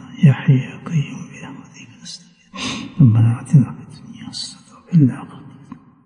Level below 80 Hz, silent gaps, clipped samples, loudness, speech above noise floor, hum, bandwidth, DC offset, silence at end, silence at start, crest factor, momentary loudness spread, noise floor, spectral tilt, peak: -56 dBFS; none; under 0.1%; -17 LUFS; 26 dB; none; 10 kHz; under 0.1%; 0.65 s; 0.05 s; 16 dB; 23 LU; -41 dBFS; -7 dB/octave; -2 dBFS